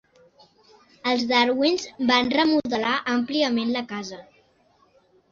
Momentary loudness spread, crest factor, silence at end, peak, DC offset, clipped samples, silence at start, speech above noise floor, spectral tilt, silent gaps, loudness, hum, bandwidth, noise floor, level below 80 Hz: 12 LU; 20 dB; 1.1 s; -4 dBFS; under 0.1%; under 0.1%; 1.05 s; 39 dB; -3.5 dB/octave; none; -22 LUFS; none; 7.4 kHz; -61 dBFS; -64 dBFS